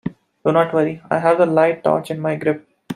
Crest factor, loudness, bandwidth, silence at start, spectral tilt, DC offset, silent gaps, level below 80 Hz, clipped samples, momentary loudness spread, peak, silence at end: 16 dB; -18 LUFS; 12.5 kHz; 0.05 s; -7.5 dB/octave; under 0.1%; none; -62 dBFS; under 0.1%; 8 LU; -2 dBFS; 0 s